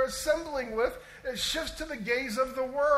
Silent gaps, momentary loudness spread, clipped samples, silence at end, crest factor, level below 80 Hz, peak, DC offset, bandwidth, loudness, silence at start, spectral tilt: none; 7 LU; under 0.1%; 0 s; 16 dB; -50 dBFS; -14 dBFS; under 0.1%; 16 kHz; -31 LUFS; 0 s; -2.5 dB/octave